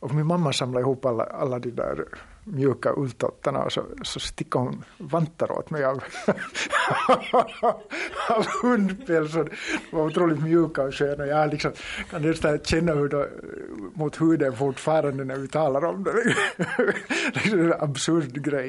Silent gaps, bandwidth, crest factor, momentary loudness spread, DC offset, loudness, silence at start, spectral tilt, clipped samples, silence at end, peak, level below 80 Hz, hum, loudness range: none; 11.5 kHz; 18 dB; 9 LU; under 0.1%; -25 LUFS; 0 s; -5.5 dB/octave; under 0.1%; 0 s; -8 dBFS; -50 dBFS; none; 4 LU